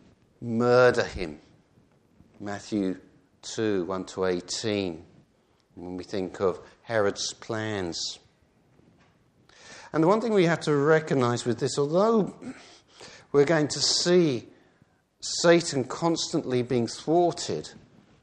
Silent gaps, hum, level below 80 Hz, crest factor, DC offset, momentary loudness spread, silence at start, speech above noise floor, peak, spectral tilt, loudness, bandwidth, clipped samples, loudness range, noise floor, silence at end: none; none; -58 dBFS; 20 dB; under 0.1%; 19 LU; 0.4 s; 40 dB; -6 dBFS; -4.5 dB/octave; -26 LUFS; 10 kHz; under 0.1%; 7 LU; -65 dBFS; 0.5 s